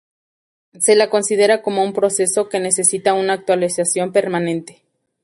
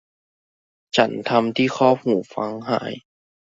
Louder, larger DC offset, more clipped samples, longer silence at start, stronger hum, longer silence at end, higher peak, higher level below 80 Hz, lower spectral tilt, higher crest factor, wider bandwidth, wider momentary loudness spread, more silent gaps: first, -17 LUFS vs -21 LUFS; neither; neither; second, 0.75 s vs 0.95 s; neither; about the same, 0.55 s vs 0.6 s; about the same, -2 dBFS vs -2 dBFS; about the same, -66 dBFS vs -64 dBFS; second, -3 dB/octave vs -5.5 dB/octave; about the same, 16 dB vs 20 dB; first, 11.5 kHz vs 7.8 kHz; second, 5 LU vs 10 LU; neither